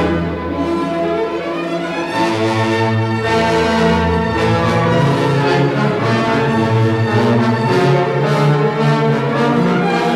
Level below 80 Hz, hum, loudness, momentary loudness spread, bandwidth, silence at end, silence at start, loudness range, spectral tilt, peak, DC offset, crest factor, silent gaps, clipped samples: -42 dBFS; none; -15 LUFS; 5 LU; 12.5 kHz; 0 s; 0 s; 2 LU; -7 dB/octave; -2 dBFS; under 0.1%; 12 dB; none; under 0.1%